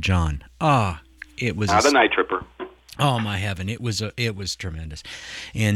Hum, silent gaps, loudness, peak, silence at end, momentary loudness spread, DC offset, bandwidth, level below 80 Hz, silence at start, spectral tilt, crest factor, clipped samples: none; none; -22 LUFS; -6 dBFS; 0 s; 17 LU; under 0.1%; 15 kHz; -40 dBFS; 0 s; -5 dB/octave; 18 dB; under 0.1%